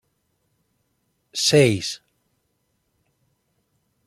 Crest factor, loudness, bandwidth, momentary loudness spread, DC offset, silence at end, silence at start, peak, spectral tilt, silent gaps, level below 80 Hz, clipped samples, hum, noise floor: 24 dB; -19 LUFS; 15.5 kHz; 17 LU; under 0.1%; 2.1 s; 1.35 s; -2 dBFS; -4 dB/octave; none; -64 dBFS; under 0.1%; none; -72 dBFS